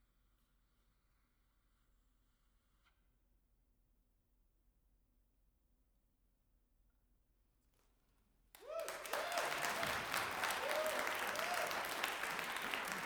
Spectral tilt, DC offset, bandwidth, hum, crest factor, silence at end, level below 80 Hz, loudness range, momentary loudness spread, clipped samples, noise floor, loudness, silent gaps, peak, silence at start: -1 dB/octave; under 0.1%; over 20 kHz; none; 28 dB; 0 s; -74 dBFS; 12 LU; 6 LU; under 0.1%; -79 dBFS; -40 LUFS; none; -20 dBFS; 8.55 s